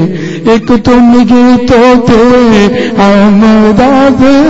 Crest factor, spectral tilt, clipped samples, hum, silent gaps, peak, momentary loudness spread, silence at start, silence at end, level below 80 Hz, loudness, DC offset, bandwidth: 4 dB; -6.5 dB/octave; 2%; none; none; 0 dBFS; 4 LU; 0 s; 0 s; -26 dBFS; -5 LUFS; under 0.1%; 8 kHz